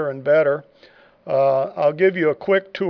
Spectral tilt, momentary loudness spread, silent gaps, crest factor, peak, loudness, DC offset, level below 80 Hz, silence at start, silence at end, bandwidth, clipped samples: -8 dB/octave; 4 LU; none; 14 dB; -6 dBFS; -19 LUFS; under 0.1%; -70 dBFS; 0 s; 0 s; 5.4 kHz; under 0.1%